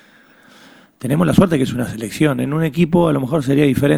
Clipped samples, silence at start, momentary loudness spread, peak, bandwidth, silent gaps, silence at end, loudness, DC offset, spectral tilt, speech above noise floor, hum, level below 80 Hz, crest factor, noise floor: under 0.1%; 1.05 s; 8 LU; 0 dBFS; 16 kHz; none; 0 s; -16 LUFS; under 0.1%; -7 dB/octave; 33 dB; none; -42 dBFS; 16 dB; -48 dBFS